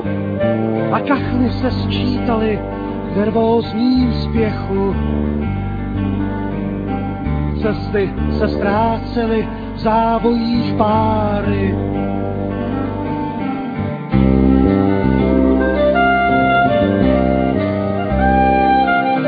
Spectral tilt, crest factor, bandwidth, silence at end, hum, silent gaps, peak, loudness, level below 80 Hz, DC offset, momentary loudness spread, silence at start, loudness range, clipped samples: -10 dB/octave; 14 dB; 5 kHz; 0 s; none; none; 0 dBFS; -16 LUFS; -28 dBFS; under 0.1%; 8 LU; 0 s; 6 LU; under 0.1%